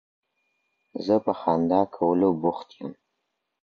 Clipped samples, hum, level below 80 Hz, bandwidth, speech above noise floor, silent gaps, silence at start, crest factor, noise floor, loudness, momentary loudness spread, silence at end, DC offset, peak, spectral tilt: under 0.1%; none; -62 dBFS; 6.6 kHz; 55 dB; none; 0.95 s; 18 dB; -79 dBFS; -24 LUFS; 17 LU; 0.7 s; under 0.1%; -8 dBFS; -9 dB/octave